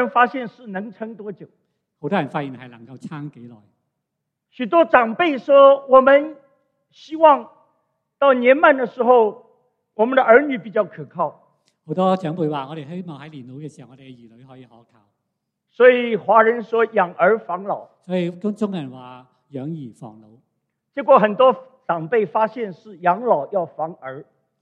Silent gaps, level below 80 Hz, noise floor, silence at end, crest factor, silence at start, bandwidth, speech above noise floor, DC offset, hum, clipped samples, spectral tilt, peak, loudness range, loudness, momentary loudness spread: none; -68 dBFS; -79 dBFS; 0.4 s; 20 dB; 0 s; 5.2 kHz; 61 dB; under 0.1%; none; under 0.1%; -7.5 dB/octave; 0 dBFS; 13 LU; -17 LUFS; 22 LU